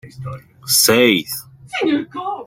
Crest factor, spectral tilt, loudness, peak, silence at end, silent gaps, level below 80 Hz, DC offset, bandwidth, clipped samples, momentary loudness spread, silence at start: 18 dB; -2.5 dB/octave; -15 LUFS; 0 dBFS; 0 s; none; -56 dBFS; under 0.1%; 16.5 kHz; under 0.1%; 20 LU; 0.05 s